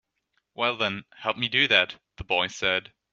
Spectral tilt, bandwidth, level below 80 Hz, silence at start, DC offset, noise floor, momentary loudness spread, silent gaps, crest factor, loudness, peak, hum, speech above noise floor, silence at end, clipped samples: 0 dB/octave; 8 kHz; -56 dBFS; 0.6 s; under 0.1%; -75 dBFS; 11 LU; none; 24 dB; -24 LUFS; -4 dBFS; none; 49 dB; 0.3 s; under 0.1%